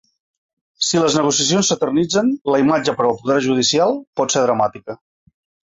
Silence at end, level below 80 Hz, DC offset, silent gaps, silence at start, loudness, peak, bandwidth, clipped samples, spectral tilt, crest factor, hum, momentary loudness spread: 0.75 s; -58 dBFS; under 0.1%; 2.41-2.45 s, 4.07-4.13 s; 0.8 s; -17 LUFS; -2 dBFS; 8 kHz; under 0.1%; -3.5 dB/octave; 16 dB; none; 6 LU